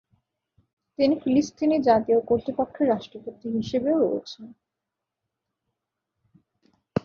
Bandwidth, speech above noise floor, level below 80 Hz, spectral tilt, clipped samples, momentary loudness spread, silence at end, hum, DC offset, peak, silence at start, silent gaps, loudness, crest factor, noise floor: 7 kHz; 62 dB; -60 dBFS; -6.5 dB/octave; under 0.1%; 16 LU; 0.05 s; none; under 0.1%; -6 dBFS; 1 s; none; -24 LUFS; 20 dB; -85 dBFS